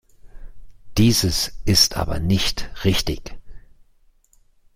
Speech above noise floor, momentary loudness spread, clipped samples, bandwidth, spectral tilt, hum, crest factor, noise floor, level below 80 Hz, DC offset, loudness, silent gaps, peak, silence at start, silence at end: 37 dB; 12 LU; under 0.1%; 16.5 kHz; -4 dB/octave; none; 20 dB; -56 dBFS; -34 dBFS; under 0.1%; -19 LUFS; none; -2 dBFS; 0.25 s; 1.15 s